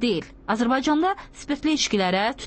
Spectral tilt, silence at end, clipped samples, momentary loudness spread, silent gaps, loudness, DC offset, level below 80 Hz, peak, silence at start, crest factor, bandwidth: -4 dB/octave; 0 s; under 0.1%; 8 LU; none; -23 LUFS; under 0.1%; -50 dBFS; -10 dBFS; 0 s; 12 dB; 8.8 kHz